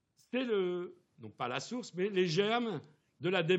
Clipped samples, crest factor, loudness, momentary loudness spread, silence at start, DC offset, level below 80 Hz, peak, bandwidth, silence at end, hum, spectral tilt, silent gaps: under 0.1%; 18 dB; -35 LUFS; 14 LU; 0.35 s; under 0.1%; -88 dBFS; -16 dBFS; 8.2 kHz; 0 s; none; -5.5 dB/octave; none